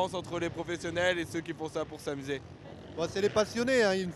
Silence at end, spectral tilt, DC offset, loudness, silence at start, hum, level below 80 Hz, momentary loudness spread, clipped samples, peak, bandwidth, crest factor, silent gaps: 0 s; -4.5 dB/octave; under 0.1%; -32 LUFS; 0 s; none; -60 dBFS; 12 LU; under 0.1%; -12 dBFS; 13 kHz; 20 dB; none